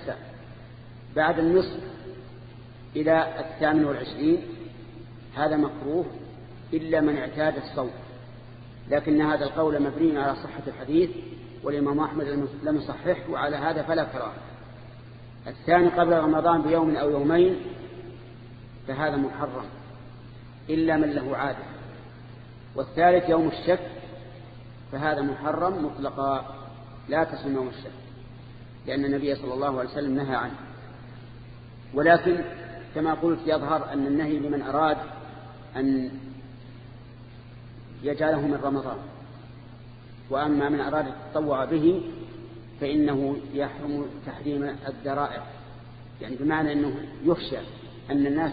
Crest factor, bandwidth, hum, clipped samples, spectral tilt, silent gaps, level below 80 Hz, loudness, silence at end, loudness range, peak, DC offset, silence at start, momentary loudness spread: 22 dB; 5 kHz; none; under 0.1%; -10 dB/octave; none; -52 dBFS; -26 LUFS; 0 s; 6 LU; -4 dBFS; under 0.1%; 0 s; 23 LU